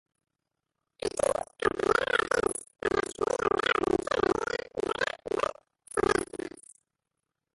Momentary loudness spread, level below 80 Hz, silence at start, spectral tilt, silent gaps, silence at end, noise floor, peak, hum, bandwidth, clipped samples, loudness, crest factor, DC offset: 8 LU; -56 dBFS; 1.05 s; -3.5 dB/octave; none; 1.05 s; -86 dBFS; -10 dBFS; none; 11.5 kHz; under 0.1%; -29 LUFS; 20 dB; under 0.1%